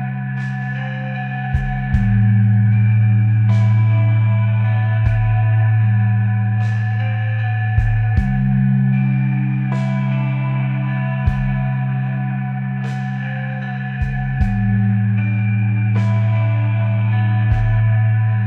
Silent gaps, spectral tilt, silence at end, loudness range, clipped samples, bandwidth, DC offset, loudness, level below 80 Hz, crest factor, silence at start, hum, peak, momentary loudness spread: none; -9.5 dB/octave; 0 s; 5 LU; under 0.1%; 4 kHz; under 0.1%; -17 LUFS; -30 dBFS; 12 dB; 0 s; none; -4 dBFS; 9 LU